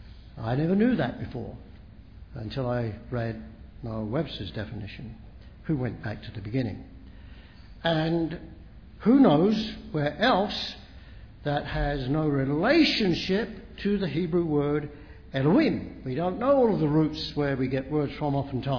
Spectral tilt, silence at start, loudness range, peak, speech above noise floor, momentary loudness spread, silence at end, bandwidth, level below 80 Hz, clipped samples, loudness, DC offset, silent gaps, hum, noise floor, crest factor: -7.5 dB/octave; 0 s; 9 LU; -8 dBFS; 22 dB; 18 LU; 0 s; 5.4 kHz; -46 dBFS; under 0.1%; -27 LUFS; 0.1%; none; none; -47 dBFS; 20 dB